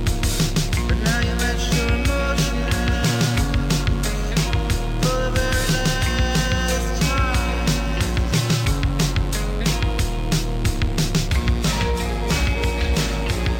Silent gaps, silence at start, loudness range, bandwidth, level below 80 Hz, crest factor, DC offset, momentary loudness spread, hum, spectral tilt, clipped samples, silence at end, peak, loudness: none; 0 s; 1 LU; 17 kHz; -24 dBFS; 10 dB; under 0.1%; 3 LU; none; -4.5 dB/octave; under 0.1%; 0 s; -8 dBFS; -21 LUFS